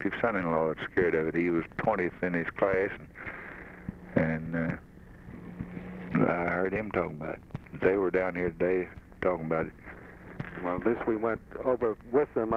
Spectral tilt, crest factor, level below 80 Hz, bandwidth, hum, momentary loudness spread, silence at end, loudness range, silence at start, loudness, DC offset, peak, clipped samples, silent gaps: -9 dB/octave; 20 dB; -54 dBFS; 6.6 kHz; none; 15 LU; 0 s; 3 LU; 0 s; -30 LUFS; under 0.1%; -10 dBFS; under 0.1%; none